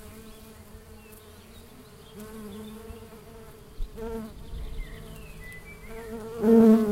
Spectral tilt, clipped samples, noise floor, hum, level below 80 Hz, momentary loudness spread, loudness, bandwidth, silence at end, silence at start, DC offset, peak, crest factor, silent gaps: -7.5 dB/octave; under 0.1%; -49 dBFS; none; -44 dBFS; 26 LU; -23 LUFS; 16 kHz; 0 s; 0.05 s; under 0.1%; -8 dBFS; 22 dB; none